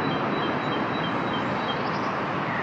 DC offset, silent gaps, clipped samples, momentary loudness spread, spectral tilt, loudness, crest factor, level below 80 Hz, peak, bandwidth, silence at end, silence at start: under 0.1%; none; under 0.1%; 1 LU; -6.5 dB/octave; -26 LUFS; 14 dB; -60 dBFS; -12 dBFS; 8.2 kHz; 0 s; 0 s